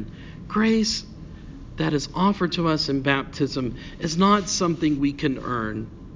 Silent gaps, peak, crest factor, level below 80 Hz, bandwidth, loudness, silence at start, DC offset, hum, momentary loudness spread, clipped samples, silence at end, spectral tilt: none; -4 dBFS; 18 dB; -44 dBFS; 7.6 kHz; -23 LUFS; 0 s; under 0.1%; none; 19 LU; under 0.1%; 0 s; -5 dB/octave